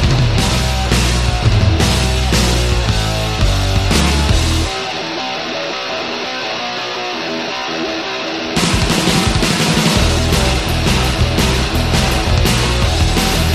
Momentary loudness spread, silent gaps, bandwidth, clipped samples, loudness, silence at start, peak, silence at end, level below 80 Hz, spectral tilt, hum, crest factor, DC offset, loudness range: 7 LU; none; 14 kHz; under 0.1%; -15 LUFS; 0 s; 0 dBFS; 0 s; -20 dBFS; -4.5 dB/octave; none; 14 dB; 0.3%; 5 LU